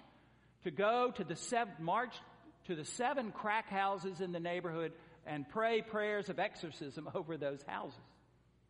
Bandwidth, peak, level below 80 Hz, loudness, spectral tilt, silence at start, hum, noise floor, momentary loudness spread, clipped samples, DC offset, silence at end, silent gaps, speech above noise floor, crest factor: 10.5 kHz; -20 dBFS; -76 dBFS; -39 LUFS; -4.5 dB/octave; 0 s; none; -69 dBFS; 11 LU; under 0.1%; under 0.1%; 0.65 s; none; 31 dB; 20 dB